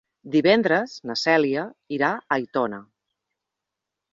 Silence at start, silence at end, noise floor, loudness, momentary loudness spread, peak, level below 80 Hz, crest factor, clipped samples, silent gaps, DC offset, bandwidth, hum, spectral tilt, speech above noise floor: 0.25 s; 1.3 s; -85 dBFS; -23 LUFS; 11 LU; -4 dBFS; -68 dBFS; 20 dB; under 0.1%; none; under 0.1%; 7.8 kHz; none; -5 dB/octave; 63 dB